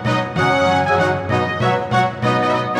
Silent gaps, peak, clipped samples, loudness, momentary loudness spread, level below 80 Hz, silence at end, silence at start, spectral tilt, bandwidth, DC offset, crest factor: none; -4 dBFS; under 0.1%; -17 LUFS; 3 LU; -48 dBFS; 0 s; 0 s; -6 dB/octave; 12 kHz; under 0.1%; 14 dB